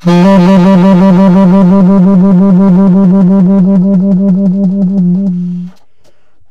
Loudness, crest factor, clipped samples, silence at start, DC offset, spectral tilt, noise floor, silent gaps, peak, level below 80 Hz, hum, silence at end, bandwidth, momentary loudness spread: -6 LUFS; 6 dB; under 0.1%; 0.05 s; under 0.1%; -9.5 dB/octave; -52 dBFS; none; 0 dBFS; -38 dBFS; none; 0.8 s; 6.2 kHz; 6 LU